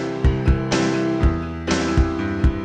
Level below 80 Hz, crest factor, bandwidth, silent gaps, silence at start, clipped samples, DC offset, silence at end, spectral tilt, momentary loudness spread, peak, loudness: -24 dBFS; 14 dB; 9.2 kHz; none; 0 s; under 0.1%; under 0.1%; 0 s; -6 dB/octave; 3 LU; -4 dBFS; -21 LUFS